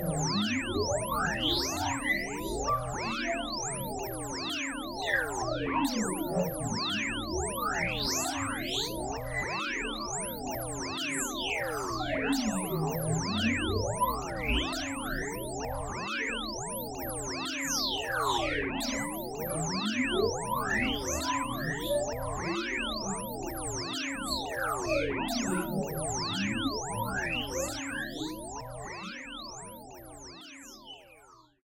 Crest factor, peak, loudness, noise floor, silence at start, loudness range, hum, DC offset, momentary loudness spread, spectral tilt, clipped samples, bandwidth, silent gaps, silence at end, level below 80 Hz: 18 dB; -14 dBFS; -32 LUFS; -58 dBFS; 0 s; 3 LU; none; under 0.1%; 7 LU; -3.5 dB/octave; under 0.1%; 16.5 kHz; none; 0.25 s; -48 dBFS